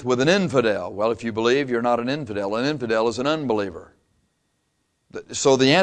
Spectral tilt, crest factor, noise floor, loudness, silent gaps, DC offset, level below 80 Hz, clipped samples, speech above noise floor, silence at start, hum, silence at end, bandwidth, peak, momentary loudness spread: -4.5 dB/octave; 18 dB; -71 dBFS; -22 LUFS; none; under 0.1%; -58 dBFS; under 0.1%; 50 dB; 0 s; none; 0 s; 10 kHz; -4 dBFS; 11 LU